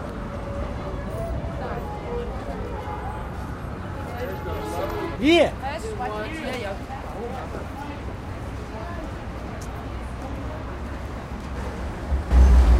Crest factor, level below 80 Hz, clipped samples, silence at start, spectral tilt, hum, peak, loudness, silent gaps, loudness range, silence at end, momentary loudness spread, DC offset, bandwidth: 20 dB; -28 dBFS; under 0.1%; 0 s; -6.5 dB/octave; none; -6 dBFS; -28 LUFS; none; 8 LU; 0 s; 14 LU; under 0.1%; 15 kHz